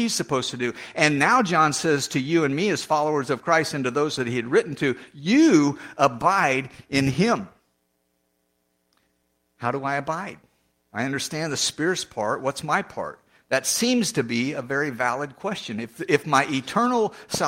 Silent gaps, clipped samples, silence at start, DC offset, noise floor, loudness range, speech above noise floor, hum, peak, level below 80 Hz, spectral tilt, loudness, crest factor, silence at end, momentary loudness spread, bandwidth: none; under 0.1%; 0 s; under 0.1%; -71 dBFS; 8 LU; 49 dB; none; -2 dBFS; -62 dBFS; -4 dB/octave; -23 LUFS; 20 dB; 0 s; 11 LU; 16.5 kHz